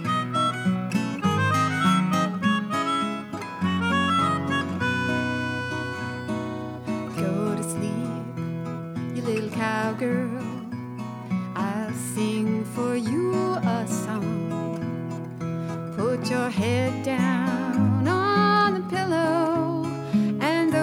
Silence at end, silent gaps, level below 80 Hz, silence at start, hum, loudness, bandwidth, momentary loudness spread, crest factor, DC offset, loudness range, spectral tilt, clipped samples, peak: 0 s; none; -62 dBFS; 0 s; none; -25 LUFS; 16.5 kHz; 10 LU; 16 dB; under 0.1%; 6 LU; -6 dB/octave; under 0.1%; -10 dBFS